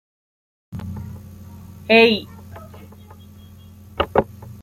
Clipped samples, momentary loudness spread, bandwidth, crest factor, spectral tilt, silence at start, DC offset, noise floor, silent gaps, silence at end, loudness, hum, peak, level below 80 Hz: under 0.1%; 27 LU; 15.5 kHz; 22 dB; -6 dB/octave; 0.7 s; under 0.1%; -43 dBFS; none; 0 s; -17 LUFS; none; -2 dBFS; -48 dBFS